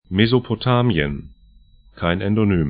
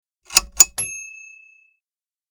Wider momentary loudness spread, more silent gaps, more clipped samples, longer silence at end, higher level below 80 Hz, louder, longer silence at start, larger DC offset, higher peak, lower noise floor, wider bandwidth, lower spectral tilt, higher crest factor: second, 8 LU vs 19 LU; neither; neither; second, 0 s vs 1.25 s; first, -40 dBFS vs -48 dBFS; second, -19 LUFS vs -16 LUFS; second, 0.1 s vs 0.3 s; neither; about the same, 0 dBFS vs 0 dBFS; second, -50 dBFS vs under -90 dBFS; second, 5 kHz vs over 20 kHz; first, -12 dB/octave vs 2 dB/octave; second, 18 dB vs 24 dB